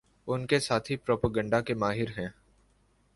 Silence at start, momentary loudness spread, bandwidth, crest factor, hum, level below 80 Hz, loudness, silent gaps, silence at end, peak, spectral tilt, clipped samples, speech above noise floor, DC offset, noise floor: 0.25 s; 8 LU; 11.5 kHz; 22 dB; 50 Hz at -55 dBFS; -54 dBFS; -30 LUFS; none; 0.85 s; -10 dBFS; -5.5 dB/octave; under 0.1%; 38 dB; under 0.1%; -67 dBFS